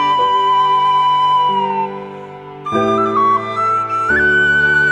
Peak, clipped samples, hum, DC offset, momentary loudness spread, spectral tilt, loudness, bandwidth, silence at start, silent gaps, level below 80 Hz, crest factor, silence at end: -2 dBFS; under 0.1%; none; under 0.1%; 15 LU; -4.5 dB/octave; -14 LUFS; 9.6 kHz; 0 s; none; -46 dBFS; 12 dB; 0 s